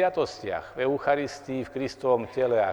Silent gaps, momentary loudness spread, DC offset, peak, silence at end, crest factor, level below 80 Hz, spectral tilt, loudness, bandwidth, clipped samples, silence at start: none; 8 LU; under 0.1%; -10 dBFS; 0 s; 16 dB; -60 dBFS; -5.5 dB/octave; -28 LUFS; 18.5 kHz; under 0.1%; 0 s